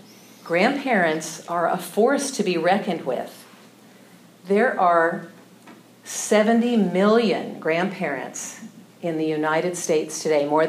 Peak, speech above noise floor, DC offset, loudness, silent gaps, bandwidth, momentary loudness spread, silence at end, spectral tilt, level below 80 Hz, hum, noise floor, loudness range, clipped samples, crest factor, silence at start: -4 dBFS; 28 dB; under 0.1%; -22 LUFS; none; 15.5 kHz; 13 LU; 0 s; -4.5 dB/octave; -84 dBFS; none; -49 dBFS; 4 LU; under 0.1%; 18 dB; 0.45 s